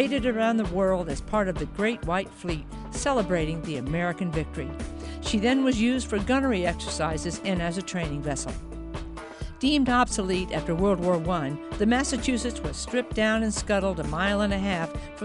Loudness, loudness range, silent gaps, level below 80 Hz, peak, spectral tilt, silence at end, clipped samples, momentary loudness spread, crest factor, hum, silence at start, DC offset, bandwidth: -27 LUFS; 3 LU; none; -38 dBFS; -8 dBFS; -5 dB/octave; 0 s; under 0.1%; 11 LU; 18 dB; none; 0 s; under 0.1%; 11 kHz